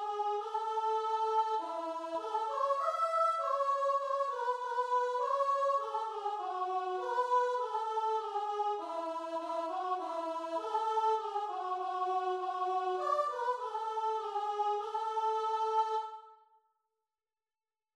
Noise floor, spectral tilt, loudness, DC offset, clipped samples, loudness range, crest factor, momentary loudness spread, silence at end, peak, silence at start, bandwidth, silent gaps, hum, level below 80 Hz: under -90 dBFS; -1.5 dB/octave; -34 LUFS; under 0.1%; under 0.1%; 3 LU; 14 dB; 6 LU; 1.6 s; -20 dBFS; 0 s; 11.5 kHz; none; none; -84 dBFS